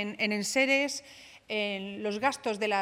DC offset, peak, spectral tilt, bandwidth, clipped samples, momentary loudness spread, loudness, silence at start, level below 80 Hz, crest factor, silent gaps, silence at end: under 0.1%; -12 dBFS; -3 dB/octave; 16.5 kHz; under 0.1%; 10 LU; -29 LUFS; 0 s; -74 dBFS; 18 dB; none; 0 s